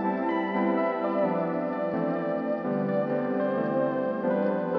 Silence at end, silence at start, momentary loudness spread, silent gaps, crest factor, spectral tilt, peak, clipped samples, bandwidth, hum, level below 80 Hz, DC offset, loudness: 0 s; 0 s; 3 LU; none; 12 dB; -10 dB/octave; -14 dBFS; under 0.1%; 5.6 kHz; none; -68 dBFS; under 0.1%; -27 LUFS